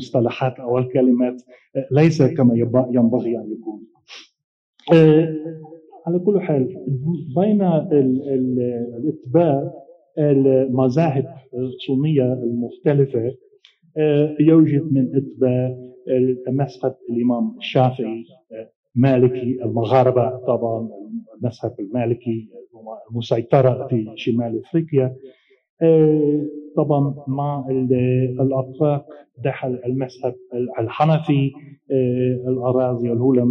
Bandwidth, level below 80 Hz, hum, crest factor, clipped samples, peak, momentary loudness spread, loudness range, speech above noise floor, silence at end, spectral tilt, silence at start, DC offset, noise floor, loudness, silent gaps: 7 kHz; -62 dBFS; none; 16 dB; under 0.1%; -2 dBFS; 13 LU; 4 LU; 35 dB; 0 s; -9.5 dB/octave; 0 s; under 0.1%; -54 dBFS; -19 LUFS; 4.44-4.73 s, 18.76-18.83 s, 25.69-25.77 s